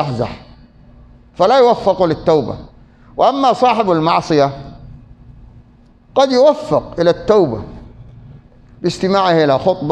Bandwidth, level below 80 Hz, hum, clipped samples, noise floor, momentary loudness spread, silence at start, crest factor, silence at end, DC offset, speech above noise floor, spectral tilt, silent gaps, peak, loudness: 9.6 kHz; -42 dBFS; none; under 0.1%; -46 dBFS; 16 LU; 0 s; 16 dB; 0 s; under 0.1%; 33 dB; -6.5 dB/octave; none; 0 dBFS; -14 LUFS